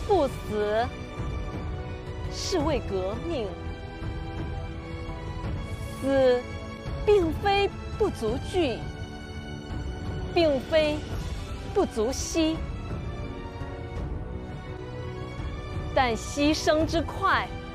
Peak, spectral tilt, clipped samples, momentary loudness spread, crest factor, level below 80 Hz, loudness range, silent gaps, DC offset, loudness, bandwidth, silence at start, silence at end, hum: -10 dBFS; -5.5 dB/octave; under 0.1%; 13 LU; 18 dB; -38 dBFS; 6 LU; none; under 0.1%; -29 LUFS; 15.5 kHz; 0 s; 0 s; none